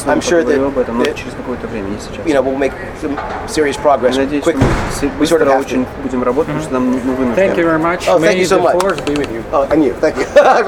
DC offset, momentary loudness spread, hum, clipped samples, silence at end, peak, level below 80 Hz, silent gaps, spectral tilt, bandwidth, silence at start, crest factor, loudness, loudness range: under 0.1%; 10 LU; none; under 0.1%; 0 s; 0 dBFS; -32 dBFS; none; -5.5 dB/octave; 17.5 kHz; 0 s; 14 dB; -14 LUFS; 4 LU